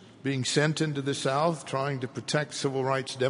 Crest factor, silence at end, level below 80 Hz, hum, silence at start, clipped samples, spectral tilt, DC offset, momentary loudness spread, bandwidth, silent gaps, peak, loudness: 20 dB; 0 s; -70 dBFS; none; 0 s; under 0.1%; -4.5 dB/octave; under 0.1%; 6 LU; 11 kHz; none; -10 dBFS; -28 LUFS